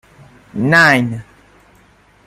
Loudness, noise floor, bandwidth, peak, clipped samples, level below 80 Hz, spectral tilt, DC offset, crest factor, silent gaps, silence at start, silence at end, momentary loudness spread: -12 LUFS; -50 dBFS; 15.5 kHz; 0 dBFS; under 0.1%; -52 dBFS; -5.5 dB/octave; under 0.1%; 18 dB; none; 0.55 s; 1.05 s; 20 LU